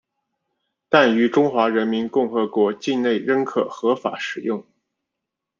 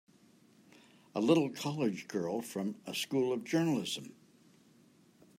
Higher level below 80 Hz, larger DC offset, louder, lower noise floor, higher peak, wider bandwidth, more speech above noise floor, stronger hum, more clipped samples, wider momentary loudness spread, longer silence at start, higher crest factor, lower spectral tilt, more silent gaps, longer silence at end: first, -70 dBFS vs -82 dBFS; neither; first, -20 LUFS vs -34 LUFS; first, -83 dBFS vs -64 dBFS; first, -2 dBFS vs -14 dBFS; second, 7.4 kHz vs 16 kHz; first, 63 dB vs 31 dB; neither; neither; about the same, 9 LU vs 10 LU; second, 0.9 s vs 1.15 s; about the same, 20 dB vs 22 dB; about the same, -5.5 dB/octave vs -5.5 dB/octave; neither; second, 1 s vs 1.25 s